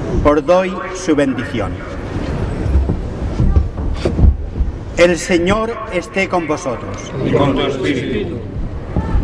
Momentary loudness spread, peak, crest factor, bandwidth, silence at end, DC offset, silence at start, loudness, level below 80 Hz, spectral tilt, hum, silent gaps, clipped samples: 10 LU; -2 dBFS; 14 dB; 11 kHz; 0 s; under 0.1%; 0 s; -17 LUFS; -22 dBFS; -6.5 dB/octave; none; none; under 0.1%